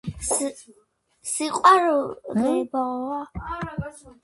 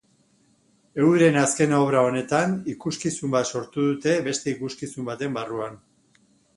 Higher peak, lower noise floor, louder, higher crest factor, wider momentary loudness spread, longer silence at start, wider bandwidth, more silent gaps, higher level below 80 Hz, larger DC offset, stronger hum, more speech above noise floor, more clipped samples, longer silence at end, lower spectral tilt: about the same, -4 dBFS vs -4 dBFS; second, -50 dBFS vs -63 dBFS; about the same, -23 LUFS vs -23 LUFS; about the same, 22 dB vs 20 dB; about the same, 16 LU vs 14 LU; second, 0.05 s vs 0.95 s; about the same, 12 kHz vs 11.5 kHz; neither; first, -48 dBFS vs -64 dBFS; neither; neither; second, 27 dB vs 40 dB; neither; second, 0.1 s vs 0.8 s; about the same, -4 dB/octave vs -5 dB/octave